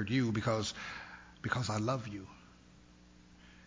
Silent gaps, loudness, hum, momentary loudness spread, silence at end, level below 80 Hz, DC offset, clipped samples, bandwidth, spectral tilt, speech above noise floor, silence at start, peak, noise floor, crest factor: none; -36 LUFS; 60 Hz at -60 dBFS; 17 LU; 0 s; -60 dBFS; under 0.1%; under 0.1%; 7.6 kHz; -5.5 dB/octave; 25 dB; 0 s; -18 dBFS; -60 dBFS; 20 dB